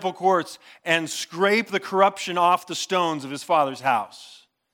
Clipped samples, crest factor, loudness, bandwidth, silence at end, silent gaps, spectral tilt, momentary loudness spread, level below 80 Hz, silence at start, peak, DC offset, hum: under 0.1%; 20 dB; -22 LUFS; 18.5 kHz; 0.4 s; none; -3.5 dB/octave; 10 LU; -84 dBFS; 0 s; -4 dBFS; under 0.1%; none